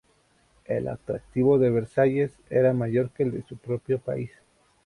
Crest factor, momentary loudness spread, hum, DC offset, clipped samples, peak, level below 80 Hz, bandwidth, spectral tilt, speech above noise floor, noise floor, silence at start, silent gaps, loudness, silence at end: 18 dB; 11 LU; none; under 0.1%; under 0.1%; -8 dBFS; -56 dBFS; 11 kHz; -9.5 dB/octave; 39 dB; -64 dBFS; 0.7 s; none; -25 LUFS; 0.6 s